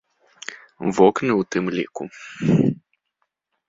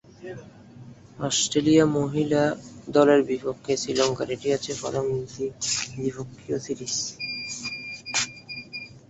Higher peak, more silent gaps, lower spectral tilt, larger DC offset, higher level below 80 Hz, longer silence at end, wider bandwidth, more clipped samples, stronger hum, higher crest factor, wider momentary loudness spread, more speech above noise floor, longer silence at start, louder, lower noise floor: first, -2 dBFS vs -6 dBFS; neither; first, -7 dB/octave vs -4 dB/octave; neither; about the same, -58 dBFS vs -58 dBFS; first, 0.95 s vs 0.1 s; about the same, 7.8 kHz vs 8.4 kHz; neither; neither; about the same, 22 dB vs 20 dB; first, 19 LU vs 16 LU; first, 55 dB vs 22 dB; first, 0.5 s vs 0.2 s; first, -21 LUFS vs -25 LUFS; first, -75 dBFS vs -46 dBFS